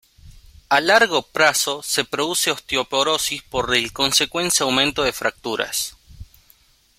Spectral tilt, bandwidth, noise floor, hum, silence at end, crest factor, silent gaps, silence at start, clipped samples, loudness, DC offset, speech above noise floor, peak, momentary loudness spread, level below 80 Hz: -1.5 dB/octave; 16.5 kHz; -56 dBFS; none; 0.75 s; 20 dB; none; 0.25 s; under 0.1%; -19 LUFS; under 0.1%; 36 dB; 0 dBFS; 8 LU; -50 dBFS